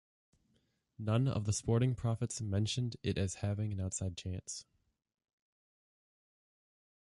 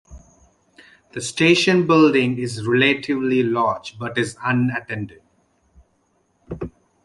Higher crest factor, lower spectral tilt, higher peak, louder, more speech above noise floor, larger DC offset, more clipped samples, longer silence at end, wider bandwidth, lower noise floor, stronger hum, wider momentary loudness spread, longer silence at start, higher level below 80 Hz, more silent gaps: about the same, 16 dB vs 18 dB; about the same, -5.5 dB/octave vs -5 dB/octave; second, -20 dBFS vs -2 dBFS; second, -36 LUFS vs -19 LUFS; second, 42 dB vs 46 dB; neither; neither; first, 2.55 s vs 0.35 s; about the same, 11.5 kHz vs 11.5 kHz; first, -77 dBFS vs -65 dBFS; neither; second, 10 LU vs 19 LU; first, 1 s vs 0.1 s; about the same, -54 dBFS vs -52 dBFS; neither